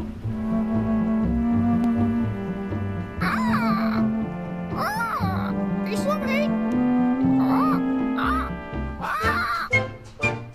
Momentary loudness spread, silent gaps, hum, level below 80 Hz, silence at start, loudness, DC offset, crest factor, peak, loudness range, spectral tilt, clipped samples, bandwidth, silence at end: 8 LU; none; none; -40 dBFS; 0 s; -24 LUFS; under 0.1%; 14 dB; -8 dBFS; 2 LU; -7 dB/octave; under 0.1%; 14.5 kHz; 0 s